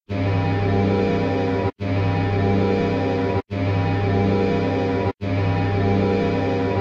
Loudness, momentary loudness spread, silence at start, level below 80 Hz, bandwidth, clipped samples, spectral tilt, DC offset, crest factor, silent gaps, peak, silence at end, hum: -21 LUFS; 4 LU; 0.1 s; -40 dBFS; 6.8 kHz; under 0.1%; -8.5 dB/octave; under 0.1%; 12 dB; none; -8 dBFS; 0 s; none